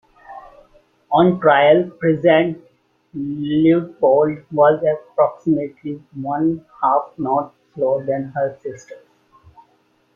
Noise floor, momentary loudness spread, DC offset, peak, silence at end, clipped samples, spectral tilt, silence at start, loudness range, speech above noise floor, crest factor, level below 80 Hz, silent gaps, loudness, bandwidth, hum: -60 dBFS; 17 LU; under 0.1%; -2 dBFS; 1.2 s; under 0.1%; -8 dB/octave; 0.3 s; 6 LU; 43 dB; 16 dB; -60 dBFS; none; -18 LUFS; 7.2 kHz; none